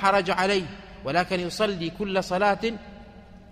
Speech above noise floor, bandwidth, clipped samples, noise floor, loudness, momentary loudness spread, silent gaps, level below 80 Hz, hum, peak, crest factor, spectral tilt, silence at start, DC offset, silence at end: 22 dB; 15.5 kHz; under 0.1%; -46 dBFS; -25 LUFS; 14 LU; none; -50 dBFS; none; -8 dBFS; 18 dB; -4.5 dB/octave; 0 s; under 0.1%; 0 s